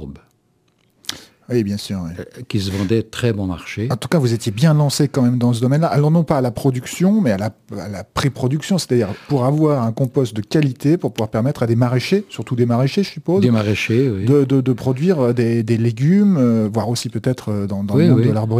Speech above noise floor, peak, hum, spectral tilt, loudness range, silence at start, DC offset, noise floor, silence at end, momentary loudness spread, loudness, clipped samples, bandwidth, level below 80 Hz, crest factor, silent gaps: 44 dB; 0 dBFS; none; -7 dB/octave; 4 LU; 0 s; under 0.1%; -61 dBFS; 0 s; 10 LU; -17 LUFS; under 0.1%; 15.5 kHz; -50 dBFS; 16 dB; none